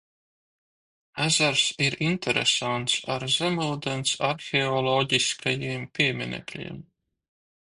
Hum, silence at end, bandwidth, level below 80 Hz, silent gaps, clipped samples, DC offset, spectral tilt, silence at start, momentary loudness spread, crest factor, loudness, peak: none; 0.9 s; 11.5 kHz; -62 dBFS; none; under 0.1%; under 0.1%; -3 dB/octave; 1.15 s; 11 LU; 20 dB; -24 LUFS; -8 dBFS